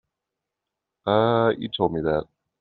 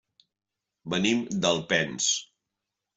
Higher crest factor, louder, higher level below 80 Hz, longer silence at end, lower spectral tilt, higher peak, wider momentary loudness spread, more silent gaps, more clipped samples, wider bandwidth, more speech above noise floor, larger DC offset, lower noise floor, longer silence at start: about the same, 20 dB vs 20 dB; first, -23 LUFS vs -26 LUFS; first, -54 dBFS vs -66 dBFS; second, 0.4 s vs 0.75 s; first, -5 dB/octave vs -3 dB/octave; first, -6 dBFS vs -10 dBFS; about the same, 7 LU vs 7 LU; neither; neither; second, 4.6 kHz vs 8.2 kHz; about the same, 63 dB vs 61 dB; neither; about the same, -85 dBFS vs -87 dBFS; first, 1.05 s vs 0.85 s